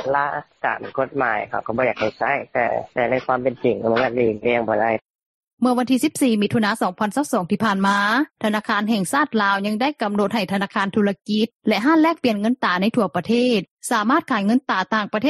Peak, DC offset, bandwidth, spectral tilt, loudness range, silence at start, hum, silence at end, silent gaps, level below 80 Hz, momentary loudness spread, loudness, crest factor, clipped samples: -4 dBFS; under 0.1%; 13 kHz; -5 dB/octave; 2 LU; 0 s; none; 0 s; 5.15-5.58 s, 11.55-11.60 s, 13.71-13.77 s; -60 dBFS; 5 LU; -20 LUFS; 16 dB; under 0.1%